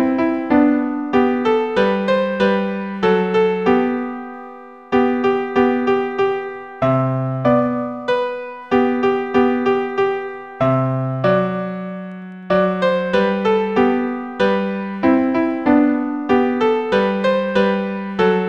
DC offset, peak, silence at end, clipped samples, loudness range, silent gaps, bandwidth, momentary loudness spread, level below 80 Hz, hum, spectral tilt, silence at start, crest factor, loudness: 0.2%; -2 dBFS; 0 s; under 0.1%; 2 LU; none; 7.6 kHz; 8 LU; -52 dBFS; none; -8 dB/octave; 0 s; 16 dB; -18 LUFS